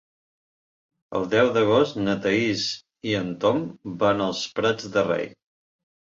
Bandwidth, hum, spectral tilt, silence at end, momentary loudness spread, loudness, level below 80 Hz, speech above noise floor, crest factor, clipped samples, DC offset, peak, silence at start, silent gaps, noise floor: 7.8 kHz; none; -5 dB/octave; 0.8 s; 9 LU; -23 LUFS; -60 dBFS; over 67 dB; 20 dB; under 0.1%; under 0.1%; -6 dBFS; 1.1 s; none; under -90 dBFS